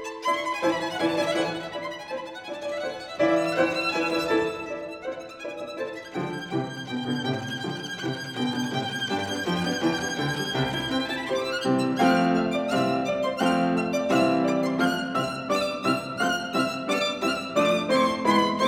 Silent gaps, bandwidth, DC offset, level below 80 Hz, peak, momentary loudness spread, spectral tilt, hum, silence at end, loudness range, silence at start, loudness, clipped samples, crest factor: none; 16.5 kHz; under 0.1%; -60 dBFS; -10 dBFS; 11 LU; -5 dB/octave; none; 0 s; 6 LU; 0 s; -26 LUFS; under 0.1%; 16 dB